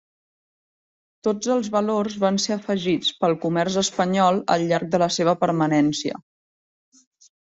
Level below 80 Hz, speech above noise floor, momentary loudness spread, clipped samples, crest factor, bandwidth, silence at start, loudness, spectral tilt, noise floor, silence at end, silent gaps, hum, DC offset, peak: -62 dBFS; over 69 dB; 5 LU; under 0.1%; 18 dB; 8 kHz; 1.25 s; -22 LUFS; -5 dB/octave; under -90 dBFS; 1.3 s; none; none; under 0.1%; -4 dBFS